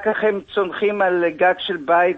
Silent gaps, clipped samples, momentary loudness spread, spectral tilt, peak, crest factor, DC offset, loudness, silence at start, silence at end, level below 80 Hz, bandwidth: none; under 0.1%; 5 LU; -7 dB/octave; -4 dBFS; 14 dB; under 0.1%; -19 LUFS; 0 s; 0 s; -60 dBFS; 5.8 kHz